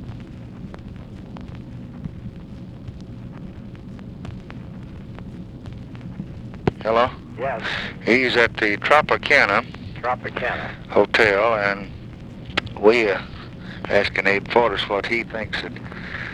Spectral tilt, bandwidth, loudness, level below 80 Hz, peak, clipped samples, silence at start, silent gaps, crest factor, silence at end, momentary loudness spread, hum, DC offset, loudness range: -5.5 dB/octave; 12 kHz; -20 LUFS; -44 dBFS; 0 dBFS; under 0.1%; 0 s; none; 22 dB; 0 s; 21 LU; none; under 0.1%; 18 LU